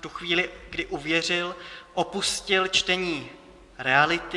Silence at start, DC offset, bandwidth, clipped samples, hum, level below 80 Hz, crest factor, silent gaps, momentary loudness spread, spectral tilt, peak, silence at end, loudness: 0 s; under 0.1%; 12 kHz; under 0.1%; none; -54 dBFS; 22 dB; none; 13 LU; -2.5 dB/octave; -4 dBFS; 0 s; -25 LUFS